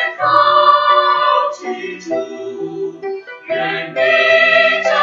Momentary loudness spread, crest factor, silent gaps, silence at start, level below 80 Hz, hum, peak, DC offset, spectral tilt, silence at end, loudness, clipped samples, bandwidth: 16 LU; 14 dB; none; 0 s; -68 dBFS; none; 0 dBFS; under 0.1%; -3.5 dB/octave; 0 s; -13 LUFS; under 0.1%; 7.6 kHz